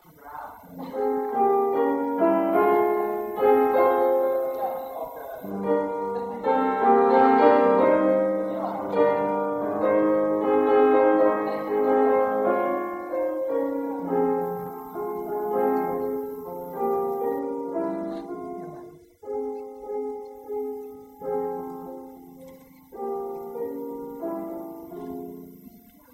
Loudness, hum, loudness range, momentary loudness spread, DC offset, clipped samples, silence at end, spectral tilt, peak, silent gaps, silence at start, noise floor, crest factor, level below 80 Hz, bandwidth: -24 LUFS; none; 14 LU; 18 LU; under 0.1%; under 0.1%; 0.35 s; -7.5 dB/octave; -6 dBFS; none; 0.25 s; -49 dBFS; 20 dB; -64 dBFS; 16 kHz